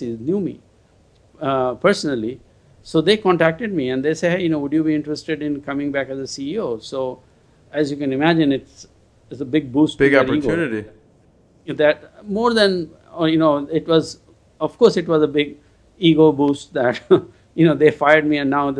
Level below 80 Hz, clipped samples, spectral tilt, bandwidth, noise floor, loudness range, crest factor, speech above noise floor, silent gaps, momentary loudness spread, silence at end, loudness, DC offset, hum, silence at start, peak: -52 dBFS; under 0.1%; -6 dB/octave; 10.5 kHz; -54 dBFS; 5 LU; 18 dB; 36 dB; none; 13 LU; 0 s; -19 LUFS; under 0.1%; none; 0 s; 0 dBFS